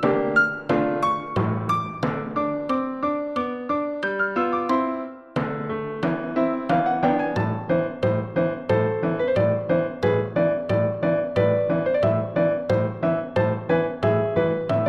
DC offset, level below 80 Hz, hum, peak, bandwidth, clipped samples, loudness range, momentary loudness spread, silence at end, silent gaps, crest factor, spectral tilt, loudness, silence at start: 0.1%; -56 dBFS; none; -8 dBFS; 8.6 kHz; under 0.1%; 3 LU; 5 LU; 0 s; none; 14 dB; -8.5 dB/octave; -23 LUFS; 0 s